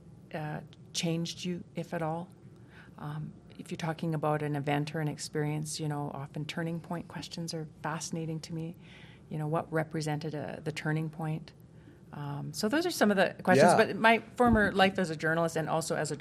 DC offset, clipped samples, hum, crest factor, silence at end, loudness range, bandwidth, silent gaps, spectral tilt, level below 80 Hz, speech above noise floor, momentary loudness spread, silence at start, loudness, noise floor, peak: under 0.1%; under 0.1%; none; 24 dB; 0 s; 11 LU; 15 kHz; none; -5 dB/octave; -56 dBFS; 23 dB; 16 LU; 0.05 s; -31 LUFS; -53 dBFS; -8 dBFS